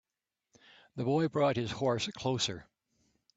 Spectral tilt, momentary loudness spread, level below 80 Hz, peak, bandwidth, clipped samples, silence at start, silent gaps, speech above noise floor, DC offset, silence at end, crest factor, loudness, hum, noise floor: -5 dB/octave; 9 LU; -66 dBFS; -16 dBFS; 9 kHz; under 0.1%; 0.95 s; none; 58 dB; under 0.1%; 0.75 s; 18 dB; -32 LUFS; none; -89 dBFS